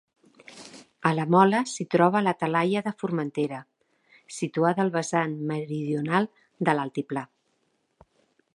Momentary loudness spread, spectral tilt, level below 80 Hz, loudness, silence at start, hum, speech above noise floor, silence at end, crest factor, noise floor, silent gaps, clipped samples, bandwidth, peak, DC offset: 16 LU; -6 dB/octave; -74 dBFS; -26 LUFS; 0.5 s; none; 47 dB; 1.3 s; 22 dB; -72 dBFS; none; under 0.1%; 11.5 kHz; -4 dBFS; under 0.1%